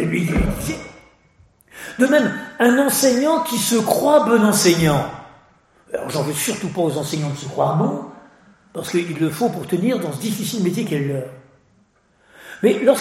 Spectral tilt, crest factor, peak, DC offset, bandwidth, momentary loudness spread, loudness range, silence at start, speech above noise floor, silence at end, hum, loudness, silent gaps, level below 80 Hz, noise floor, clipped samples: -4.5 dB/octave; 18 dB; -2 dBFS; under 0.1%; 16.5 kHz; 16 LU; 7 LU; 0 s; 40 dB; 0 s; none; -19 LUFS; none; -40 dBFS; -58 dBFS; under 0.1%